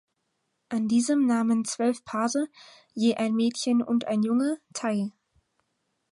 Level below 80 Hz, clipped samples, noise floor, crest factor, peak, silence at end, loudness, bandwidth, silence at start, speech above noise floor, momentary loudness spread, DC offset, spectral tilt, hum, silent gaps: -74 dBFS; under 0.1%; -77 dBFS; 14 dB; -12 dBFS; 1 s; -26 LUFS; 11.5 kHz; 0.7 s; 52 dB; 8 LU; under 0.1%; -4.5 dB/octave; none; none